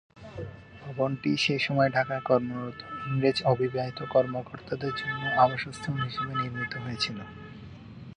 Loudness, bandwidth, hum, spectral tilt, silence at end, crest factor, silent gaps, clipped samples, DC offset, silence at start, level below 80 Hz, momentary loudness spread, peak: -28 LUFS; 10 kHz; none; -6 dB/octave; 0.05 s; 20 dB; none; under 0.1%; under 0.1%; 0.15 s; -58 dBFS; 18 LU; -8 dBFS